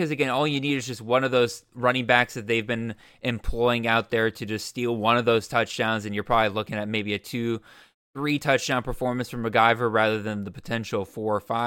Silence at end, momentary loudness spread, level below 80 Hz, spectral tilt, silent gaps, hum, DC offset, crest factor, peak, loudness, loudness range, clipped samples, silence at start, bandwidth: 0 s; 10 LU; -44 dBFS; -5 dB/octave; 7.94-8.13 s; none; under 0.1%; 22 dB; -2 dBFS; -25 LUFS; 2 LU; under 0.1%; 0 s; 17 kHz